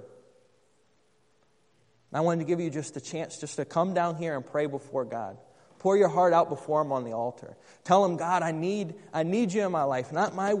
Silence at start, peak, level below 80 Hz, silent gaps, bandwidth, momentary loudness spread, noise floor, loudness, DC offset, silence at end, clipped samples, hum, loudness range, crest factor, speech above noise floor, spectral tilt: 0 s; -8 dBFS; -76 dBFS; none; 10.5 kHz; 13 LU; -69 dBFS; -28 LUFS; under 0.1%; 0 s; under 0.1%; none; 7 LU; 22 dB; 41 dB; -6 dB/octave